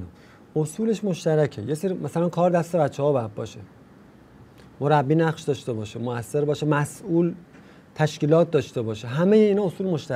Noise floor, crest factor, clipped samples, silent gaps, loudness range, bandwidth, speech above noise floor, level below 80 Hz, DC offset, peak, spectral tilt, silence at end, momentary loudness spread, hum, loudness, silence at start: -50 dBFS; 18 dB; under 0.1%; none; 3 LU; 15 kHz; 27 dB; -64 dBFS; under 0.1%; -4 dBFS; -7 dB/octave; 0 s; 11 LU; none; -23 LUFS; 0 s